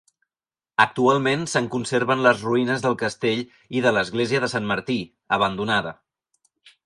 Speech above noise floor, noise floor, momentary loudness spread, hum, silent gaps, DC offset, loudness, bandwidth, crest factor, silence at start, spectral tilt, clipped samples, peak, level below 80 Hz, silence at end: over 68 dB; under -90 dBFS; 8 LU; none; none; under 0.1%; -22 LUFS; 11.5 kHz; 20 dB; 0.8 s; -5 dB/octave; under 0.1%; -2 dBFS; -60 dBFS; 0.9 s